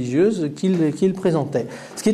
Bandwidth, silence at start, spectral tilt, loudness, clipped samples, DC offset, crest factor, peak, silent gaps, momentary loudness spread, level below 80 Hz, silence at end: 13.5 kHz; 0 s; -7 dB/octave; -21 LUFS; under 0.1%; under 0.1%; 14 dB; -6 dBFS; none; 7 LU; -62 dBFS; 0 s